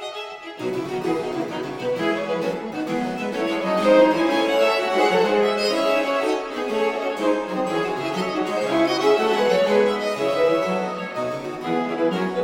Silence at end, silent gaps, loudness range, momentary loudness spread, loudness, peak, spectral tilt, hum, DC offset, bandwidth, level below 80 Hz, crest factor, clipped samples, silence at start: 0 s; none; 5 LU; 9 LU; -22 LUFS; -4 dBFS; -5 dB/octave; none; under 0.1%; 16.5 kHz; -58 dBFS; 16 dB; under 0.1%; 0 s